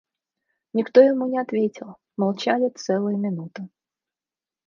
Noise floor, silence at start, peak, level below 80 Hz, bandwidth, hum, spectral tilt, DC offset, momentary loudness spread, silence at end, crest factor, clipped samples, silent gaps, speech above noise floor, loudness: under -90 dBFS; 0.75 s; -2 dBFS; -76 dBFS; 7.2 kHz; none; -6.5 dB/octave; under 0.1%; 21 LU; 1 s; 22 dB; under 0.1%; none; over 68 dB; -22 LUFS